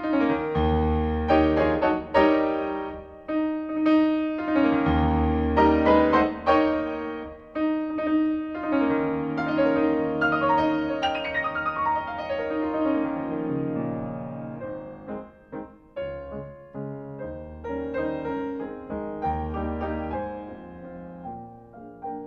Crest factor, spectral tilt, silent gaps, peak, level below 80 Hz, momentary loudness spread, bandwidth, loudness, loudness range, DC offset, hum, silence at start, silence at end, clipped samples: 18 dB; -8.5 dB/octave; none; -6 dBFS; -40 dBFS; 18 LU; 6 kHz; -25 LUFS; 11 LU; under 0.1%; none; 0 s; 0 s; under 0.1%